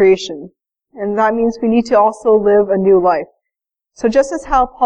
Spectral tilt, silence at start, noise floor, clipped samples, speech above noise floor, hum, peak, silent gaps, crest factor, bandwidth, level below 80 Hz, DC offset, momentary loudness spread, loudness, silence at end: -6 dB/octave; 0 s; -81 dBFS; under 0.1%; 68 dB; none; -2 dBFS; none; 12 dB; 9.4 kHz; -40 dBFS; under 0.1%; 11 LU; -14 LUFS; 0 s